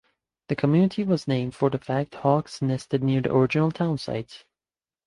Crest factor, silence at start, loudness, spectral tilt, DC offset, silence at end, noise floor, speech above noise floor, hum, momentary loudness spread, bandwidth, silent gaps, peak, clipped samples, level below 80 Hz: 18 dB; 0.5 s; -24 LUFS; -7.5 dB/octave; under 0.1%; 0.7 s; under -90 dBFS; over 66 dB; none; 8 LU; 11.5 kHz; none; -6 dBFS; under 0.1%; -58 dBFS